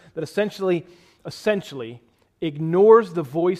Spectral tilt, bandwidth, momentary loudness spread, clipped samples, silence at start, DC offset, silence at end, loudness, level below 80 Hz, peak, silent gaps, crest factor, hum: -7 dB/octave; 13 kHz; 21 LU; under 0.1%; 0.15 s; under 0.1%; 0 s; -21 LUFS; -64 dBFS; -2 dBFS; none; 18 dB; none